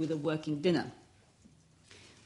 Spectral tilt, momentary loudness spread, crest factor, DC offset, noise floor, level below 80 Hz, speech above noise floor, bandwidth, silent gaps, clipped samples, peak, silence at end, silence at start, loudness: -6.5 dB/octave; 24 LU; 18 dB; under 0.1%; -62 dBFS; -72 dBFS; 30 dB; 11.5 kHz; none; under 0.1%; -18 dBFS; 0.2 s; 0 s; -33 LUFS